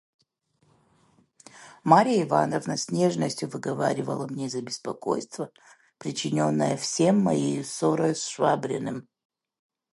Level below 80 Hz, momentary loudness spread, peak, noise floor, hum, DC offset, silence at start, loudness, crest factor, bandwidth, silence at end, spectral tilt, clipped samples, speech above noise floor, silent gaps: -70 dBFS; 13 LU; -4 dBFS; -69 dBFS; none; under 0.1%; 1.55 s; -26 LUFS; 24 dB; 11.5 kHz; 0.9 s; -5 dB/octave; under 0.1%; 44 dB; none